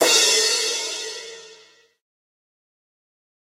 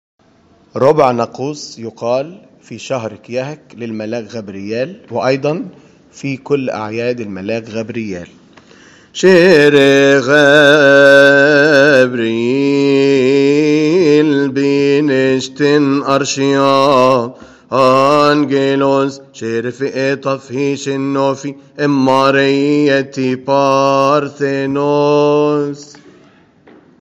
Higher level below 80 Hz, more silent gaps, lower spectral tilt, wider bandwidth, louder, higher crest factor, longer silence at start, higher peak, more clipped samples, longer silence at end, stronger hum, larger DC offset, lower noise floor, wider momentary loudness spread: second, -80 dBFS vs -58 dBFS; neither; second, 2 dB/octave vs -5.5 dB/octave; first, 16 kHz vs 11 kHz; second, -18 LUFS vs -12 LUFS; first, 20 dB vs 12 dB; second, 0 s vs 0.75 s; second, -4 dBFS vs 0 dBFS; second, under 0.1% vs 0.1%; first, 1.9 s vs 1.15 s; neither; neither; first, -53 dBFS vs -49 dBFS; first, 19 LU vs 16 LU